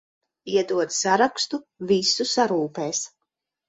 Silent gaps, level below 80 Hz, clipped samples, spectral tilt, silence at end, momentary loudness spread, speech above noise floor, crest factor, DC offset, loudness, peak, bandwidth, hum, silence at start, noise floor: none; -70 dBFS; under 0.1%; -2.5 dB/octave; 0.6 s; 9 LU; 58 dB; 18 dB; under 0.1%; -23 LUFS; -6 dBFS; 8.4 kHz; none; 0.45 s; -81 dBFS